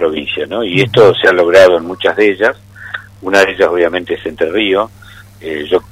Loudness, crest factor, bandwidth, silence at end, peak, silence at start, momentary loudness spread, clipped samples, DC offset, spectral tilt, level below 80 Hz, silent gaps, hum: -11 LUFS; 12 dB; 15.5 kHz; 0.1 s; 0 dBFS; 0 s; 16 LU; 0.4%; under 0.1%; -5 dB/octave; -46 dBFS; none; none